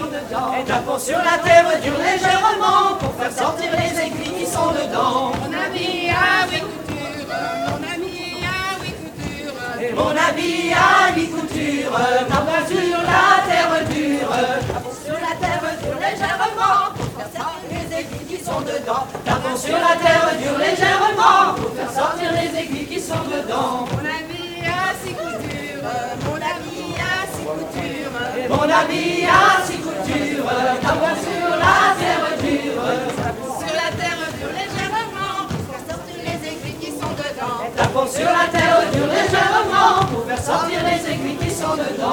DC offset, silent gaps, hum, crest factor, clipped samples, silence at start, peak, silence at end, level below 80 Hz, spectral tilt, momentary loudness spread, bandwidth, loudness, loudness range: under 0.1%; none; none; 20 dB; under 0.1%; 0 s; 0 dBFS; 0 s; -46 dBFS; -4 dB/octave; 12 LU; 19.5 kHz; -19 LUFS; 7 LU